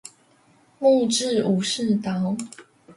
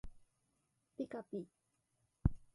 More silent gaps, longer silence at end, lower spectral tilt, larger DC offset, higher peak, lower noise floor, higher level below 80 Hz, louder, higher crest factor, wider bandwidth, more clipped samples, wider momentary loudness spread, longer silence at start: neither; second, 0.05 s vs 0.2 s; second, -5 dB/octave vs -10 dB/octave; neither; first, -8 dBFS vs -16 dBFS; second, -58 dBFS vs -82 dBFS; second, -66 dBFS vs -52 dBFS; first, -22 LUFS vs -44 LUFS; second, 16 dB vs 28 dB; about the same, 11.5 kHz vs 11.5 kHz; neither; second, 9 LU vs 18 LU; about the same, 0.05 s vs 0.05 s